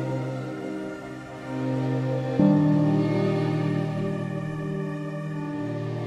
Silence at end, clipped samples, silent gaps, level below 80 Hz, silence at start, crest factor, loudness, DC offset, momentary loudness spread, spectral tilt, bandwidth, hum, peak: 0 s; under 0.1%; none; -58 dBFS; 0 s; 18 dB; -26 LUFS; under 0.1%; 13 LU; -8.5 dB/octave; 10 kHz; none; -8 dBFS